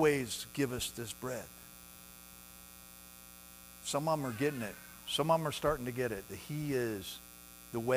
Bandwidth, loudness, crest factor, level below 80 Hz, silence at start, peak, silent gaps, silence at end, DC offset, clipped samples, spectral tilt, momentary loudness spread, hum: 16 kHz; -36 LUFS; 20 dB; -60 dBFS; 0 s; -16 dBFS; none; 0 s; under 0.1%; under 0.1%; -4.5 dB/octave; 20 LU; 60 Hz at -60 dBFS